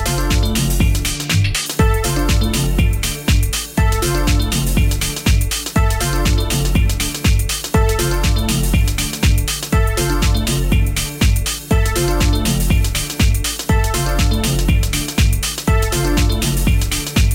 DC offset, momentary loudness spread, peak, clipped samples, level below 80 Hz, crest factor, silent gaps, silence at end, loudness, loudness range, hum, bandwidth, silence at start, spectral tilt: under 0.1%; 2 LU; -6 dBFS; under 0.1%; -18 dBFS; 10 dB; none; 0 s; -17 LUFS; 0 LU; none; 17 kHz; 0 s; -4.5 dB/octave